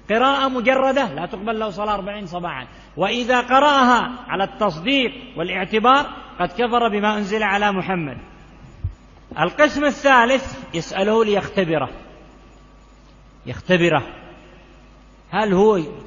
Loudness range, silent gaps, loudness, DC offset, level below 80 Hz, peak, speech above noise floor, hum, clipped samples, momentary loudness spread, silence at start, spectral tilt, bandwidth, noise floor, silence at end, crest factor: 5 LU; none; -19 LUFS; under 0.1%; -46 dBFS; 0 dBFS; 28 dB; none; under 0.1%; 15 LU; 0.1 s; -5 dB/octave; 7.4 kHz; -47 dBFS; 0 s; 20 dB